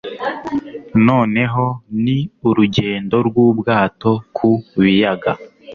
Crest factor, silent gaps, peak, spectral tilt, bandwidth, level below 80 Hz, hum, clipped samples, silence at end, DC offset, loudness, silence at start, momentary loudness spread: 14 dB; none; -2 dBFS; -8 dB/octave; 6.6 kHz; -48 dBFS; none; under 0.1%; 0 s; under 0.1%; -16 LUFS; 0.05 s; 10 LU